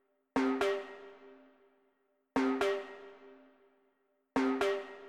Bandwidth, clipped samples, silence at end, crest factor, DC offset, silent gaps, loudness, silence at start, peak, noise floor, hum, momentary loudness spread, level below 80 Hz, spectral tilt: 13 kHz; under 0.1%; 0 s; 18 dB; under 0.1%; none; -34 LUFS; 0.35 s; -18 dBFS; -76 dBFS; none; 21 LU; -68 dBFS; -4.5 dB/octave